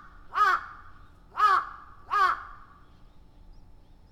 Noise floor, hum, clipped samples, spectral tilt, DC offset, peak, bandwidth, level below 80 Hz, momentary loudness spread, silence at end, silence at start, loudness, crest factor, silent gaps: -53 dBFS; none; under 0.1%; -2.5 dB/octave; under 0.1%; -12 dBFS; 15 kHz; -54 dBFS; 22 LU; 1.55 s; 0.25 s; -25 LUFS; 18 dB; none